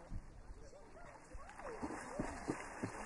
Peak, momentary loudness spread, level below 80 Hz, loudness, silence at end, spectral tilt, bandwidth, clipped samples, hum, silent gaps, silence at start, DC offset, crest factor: -26 dBFS; 14 LU; -56 dBFS; -49 LUFS; 0 s; -5.5 dB/octave; 11.5 kHz; under 0.1%; none; none; 0 s; under 0.1%; 22 dB